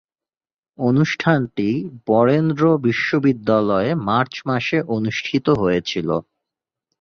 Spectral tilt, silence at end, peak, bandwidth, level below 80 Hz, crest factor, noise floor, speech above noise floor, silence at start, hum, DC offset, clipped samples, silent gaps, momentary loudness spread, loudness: -7 dB/octave; 0.8 s; -2 dBFS; 7 kHz; -52 dBFS; 16 dB; under -90 dBFS; over 72 dB; 0.8 s; none; under 0.1%; under 0.1%; none; 6 LU; -19 LUFS